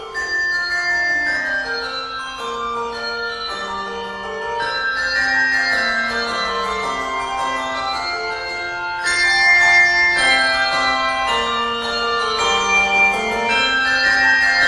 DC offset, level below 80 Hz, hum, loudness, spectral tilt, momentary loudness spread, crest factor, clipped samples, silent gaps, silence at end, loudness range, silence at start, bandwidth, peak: under 0.1%; -46 dBFS; none; -17 LUFS; -1 dB/octave; 12 LU; 16 dB; under 0.1%; none; 0 s; 8 LU; 0 s; 12.5 kHz; -2 dBFS